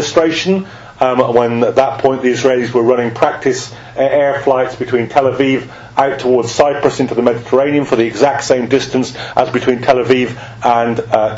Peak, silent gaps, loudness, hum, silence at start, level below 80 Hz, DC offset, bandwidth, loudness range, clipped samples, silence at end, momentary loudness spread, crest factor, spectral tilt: 0 dBFS; none; -14 LUFS; none; 0 s; -48 dBFS; under 0.1%; 8 kHz; 1 LU; 0.2%; 0 s; 5 LU; 14 dB; -5 dB/octave